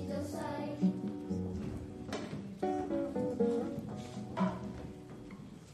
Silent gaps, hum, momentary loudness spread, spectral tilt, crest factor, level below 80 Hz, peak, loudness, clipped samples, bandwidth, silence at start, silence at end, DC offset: none; none; 14 LU; -7.5 dB/octave; 18 dB; -56 dBFS; -20 dBFS; -38 LUFS; under 0.1%; 13 kHz; 0 s; 0 s; under 0.1%